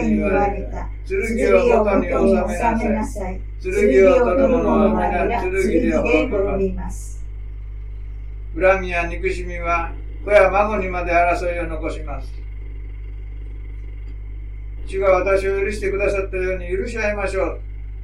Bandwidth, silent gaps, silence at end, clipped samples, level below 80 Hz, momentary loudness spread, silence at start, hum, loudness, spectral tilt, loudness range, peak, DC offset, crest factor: 12 kHz; none; 0 s; under 0.1%; -28 dBFS; 19 LU; 0 s; none; -19 LUFS; -6.5 dB/octave; 7 LU; 0 dBFS; under 0.1%; 18 dB